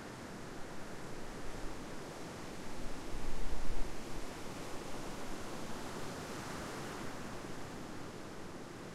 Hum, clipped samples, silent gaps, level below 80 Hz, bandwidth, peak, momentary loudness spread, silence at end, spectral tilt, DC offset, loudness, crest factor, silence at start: none; under 0.1%; none; -46 dBFS; 14 kHz; -20 dBFS; 4 LU; 0 s; -4.5 dB/octave; under 0.1%; -46 LUFS; 16 dB; 0 s